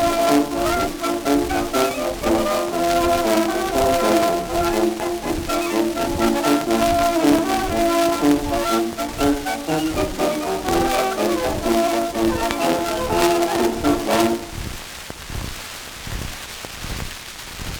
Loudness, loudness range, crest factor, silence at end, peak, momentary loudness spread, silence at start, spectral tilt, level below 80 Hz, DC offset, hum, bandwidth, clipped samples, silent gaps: -20 LUFS; 4 LU; 20 dB; 0 s; 0 dBFS; 13 LU; 0 s; -4 dB/octave; -36 dBFS; under 0.1%; none; over 20 kHz; under 0.1%; none